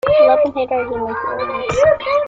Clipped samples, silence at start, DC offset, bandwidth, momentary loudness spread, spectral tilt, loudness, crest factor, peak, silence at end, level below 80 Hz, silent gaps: under 0.1%; 0.05 s; under 0.1%; 7.8 kHz; 10 LU; -5 dB/octave; -16 LUFS; 14 dB; -2 dBFS; 0 s; -44 dBFS; none